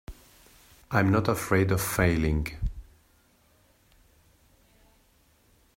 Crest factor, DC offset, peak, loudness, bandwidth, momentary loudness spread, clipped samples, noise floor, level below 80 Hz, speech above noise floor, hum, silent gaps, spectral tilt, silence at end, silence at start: 22 dB; under 0.1%; -8 dBFS; -26 LUFS; 16 kHz; 13 LU; under 0.1%; -63 dBFS; -42 dBFS; 39 dB; none; none; -6 dB/octave; 2.95 s; 0.1 s